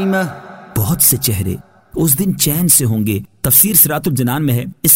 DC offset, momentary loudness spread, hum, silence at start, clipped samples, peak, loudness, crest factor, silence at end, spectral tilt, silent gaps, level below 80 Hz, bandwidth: under 0.1%; 13 LU; none; 0 s; under 0.1%; 0 dBFS; -13 LUFS; 14 dB; 0 s; -4 dB/octave; none; -42 dBFS; 16.5 kHz